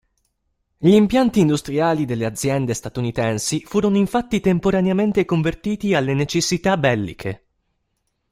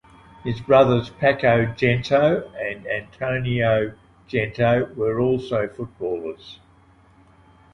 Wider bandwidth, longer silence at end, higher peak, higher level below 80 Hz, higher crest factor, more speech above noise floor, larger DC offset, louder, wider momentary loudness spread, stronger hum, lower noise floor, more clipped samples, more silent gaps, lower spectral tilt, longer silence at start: first, 15.5 kHz vs 7.2 kHz; second, 0.95 s vs 1.2 s; about the same, -2 dBFS vs -4 dBFS; about the same, -46 dBFS vs -50 dBFS; about the same, 18 dB vs 18 dB; first, 53 dB vs 33 dB; neither; about the same, -19 LUFS vs -21 LUFS; second, 8 LU vs 12 LU; neither; first, -72 dBFS vs -53 dBFS; neither; neither; second, -5.5 dB/octave vs -7.5 dB/octave; first, 0.8 s vs 0.45 s